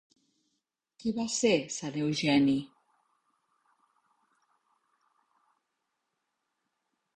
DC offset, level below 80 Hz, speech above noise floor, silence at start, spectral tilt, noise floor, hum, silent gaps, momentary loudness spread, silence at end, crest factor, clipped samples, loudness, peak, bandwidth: under 0.1%; -70 dBFS; 55 dB; 1.05 s; -4.5 dB/octave; -83 dBFS; none; none; 10 LU; 4.5 s; 22 dB; under 0.1%; -29 LUFS; -14 dBFS; 9.8 kHz